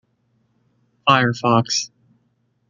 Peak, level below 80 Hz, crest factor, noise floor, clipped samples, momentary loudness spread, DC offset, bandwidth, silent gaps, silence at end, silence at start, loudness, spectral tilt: -2 dBFS; -64 dBFS; 22 dB; -66 dBFS; under 0.1%; 7 LU; under 0.1%; 7.6 kHz; none; 0.85 s; 1.05 s; -18 LUFS; -4 dB/octave